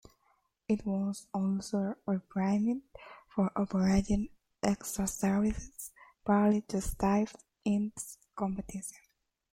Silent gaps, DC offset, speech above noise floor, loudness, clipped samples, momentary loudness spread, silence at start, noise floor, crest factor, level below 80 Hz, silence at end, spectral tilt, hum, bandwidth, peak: none; under 0.1%; 42 dB; -33 LUFS; under 0.1%; 15 LU; 0.7 s; -74 dBFS; 18 dB; -50 dBFS; 0.55 s; -6.5 dB/octave; none; 16.5 kHz; -14 dBFS